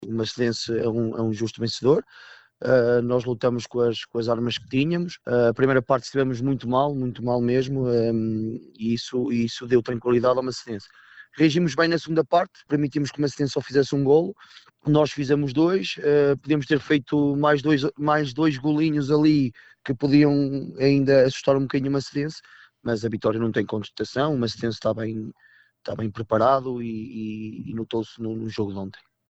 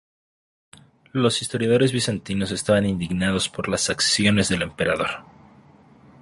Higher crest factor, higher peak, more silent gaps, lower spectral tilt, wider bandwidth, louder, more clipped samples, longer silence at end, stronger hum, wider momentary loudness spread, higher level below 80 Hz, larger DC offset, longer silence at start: about the same, 16 dB vs 18 dB; about the same, -6 dBFS vs -4 dBFS; neither; first, -6.5 dB/octave vs -4 dB/octave; second, 8.2 kHz vs 11.5 kHz; about the same, -23 LUFS vs -22 LUFS; neither; second, 0.35 s vs 1 s; neither; first, 11 LU vs 7 LU; second, -54 dBFS vs -48 dBFS; neither; second, 0 s vs 1.15 s